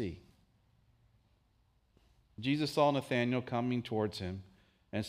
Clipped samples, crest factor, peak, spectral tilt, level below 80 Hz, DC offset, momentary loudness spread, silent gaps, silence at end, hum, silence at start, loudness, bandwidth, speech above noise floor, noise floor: under 0.1%; 22 dB; -16 dBFS; -6.5 dB/octave; -68 dBFS; under 0.1%; 13 LU; none; 0 s; none; 0 s; -34 LUFS; 15.5 kHz; 39 dB; -72 dBFS